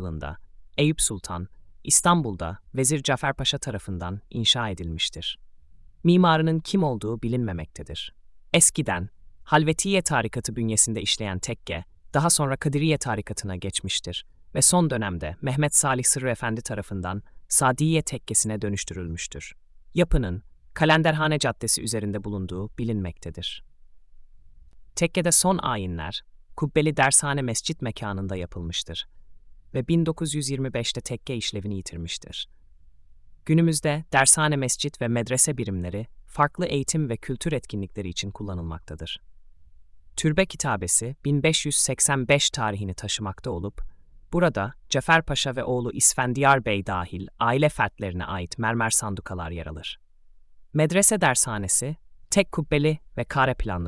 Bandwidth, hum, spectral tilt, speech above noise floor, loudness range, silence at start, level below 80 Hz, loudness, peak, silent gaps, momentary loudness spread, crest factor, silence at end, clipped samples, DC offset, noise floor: 12 kHz; none; -3.5 dB/octave; 27 dB; 6 LU; 0 s; -44 dBFS; -24 LUFS; -2 dBFS; none; 15 LU; 22 dB; 0 s; under 0.1%; under 0.1%; -51 dBFS